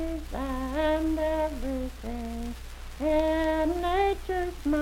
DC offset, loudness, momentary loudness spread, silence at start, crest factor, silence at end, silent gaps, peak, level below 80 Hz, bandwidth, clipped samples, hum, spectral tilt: under 0.1%; -29 LUFS; 11 LU; 0 s; 14 dB; 0 s; none; -14 dBFS; -38 dBFS; 16.5 kHz; under 0.1%; 60 Hz at -40 dBFS; -6 dB/octave